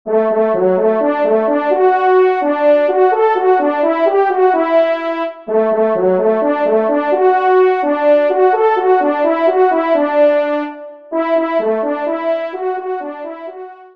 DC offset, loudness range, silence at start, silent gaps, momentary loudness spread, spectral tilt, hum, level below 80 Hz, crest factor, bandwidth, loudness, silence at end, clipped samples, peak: 0.3%; 4 LU; 0.05 s; none; 9 LU; -8 dB/octave; none; -68 dBFS; 12 dB; 5.2 kHz; -14 LUFS; 0.1 s; under 0.1%; -2 dBFS